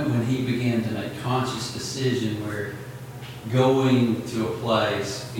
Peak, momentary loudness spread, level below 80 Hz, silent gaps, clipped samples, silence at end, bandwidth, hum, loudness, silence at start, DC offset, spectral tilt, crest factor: -8 dBFS; 14 LU; -56 dBFS; none; under 0.1%; 0 s; 17 kHz; none; -24 LUFS; 0 s; under 0.1%; -6 dB/octave; 16 dB